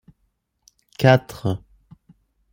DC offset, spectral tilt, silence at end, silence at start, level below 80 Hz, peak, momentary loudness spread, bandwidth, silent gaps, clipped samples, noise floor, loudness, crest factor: under 0.1%; -7 dB/octave; 0.95 s; 1 s; -54 dBFS; -2 dBFS; 17 LU; 16.5 kHz; none; under 0.1%; -70 dBFS; -20 LUFS; 22 dB